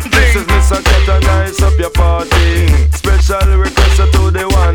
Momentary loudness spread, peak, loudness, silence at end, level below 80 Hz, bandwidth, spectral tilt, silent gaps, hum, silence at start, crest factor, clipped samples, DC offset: 2 LU; -2 dBFS; -11 LUFS; 0 s; -10 dBFS; 18 kHz; -5 dB/octave; none; none; 0 s; 8 dB; under 0.1%; under 0.1%